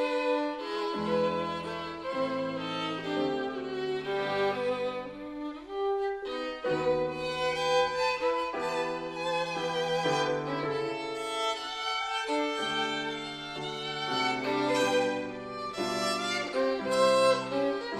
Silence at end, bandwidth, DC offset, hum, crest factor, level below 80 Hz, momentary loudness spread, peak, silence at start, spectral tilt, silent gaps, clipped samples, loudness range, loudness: 0 s; 13.5 kHz; under 0.1%; none; 18 dB; -64 dBFS; 8 LU; -12 dBFS; 0 s; -4 dB/octave; none; under 0.1%; 4 LU; -30 LUFS